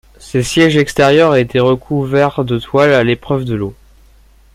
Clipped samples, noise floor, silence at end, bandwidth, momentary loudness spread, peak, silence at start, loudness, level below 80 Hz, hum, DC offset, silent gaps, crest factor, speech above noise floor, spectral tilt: under 0.1%; -45 dBFS; 0.8 s; 16 kHz; 9 LU; 0 dBFS; 0.2 s; -13 LUFS; -40 dBFS; none; under 0.1%; none; 14 dB; 33 dB; -6 dB/octave